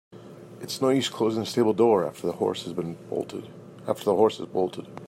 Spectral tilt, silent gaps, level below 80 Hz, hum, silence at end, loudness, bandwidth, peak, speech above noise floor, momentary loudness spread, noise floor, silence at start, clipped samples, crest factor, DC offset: -5.5 dB/octave; none; -72 dBFS; none; 0 s; -26 LUFS; 16 kHz; -8 dBFS; 19 dB; 18 LU; -45 dBFS; 0.1 s; under 0.1%; 20 dB; under 0.1%